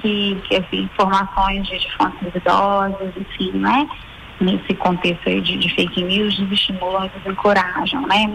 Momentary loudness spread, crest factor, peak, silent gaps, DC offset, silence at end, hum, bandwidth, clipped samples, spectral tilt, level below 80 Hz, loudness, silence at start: 7 LU; 14 dB; -6 dBFS; none; under 0.1%; 0 s; none; 11 kHz; under 0.1%; -5.5 dB/octave; -38 dBFS; -18 LUFS; 0 s